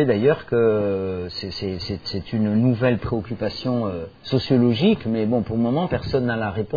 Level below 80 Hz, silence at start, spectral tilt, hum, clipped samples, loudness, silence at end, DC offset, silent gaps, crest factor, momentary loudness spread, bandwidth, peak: -46 dBFS; 0 s; -8.5 dB/octave; none; under 0.1%; -22 LUFS; 0 s; under 0.1%; none; 16 dB; 9 LU; 5 kHz; -6 dBFS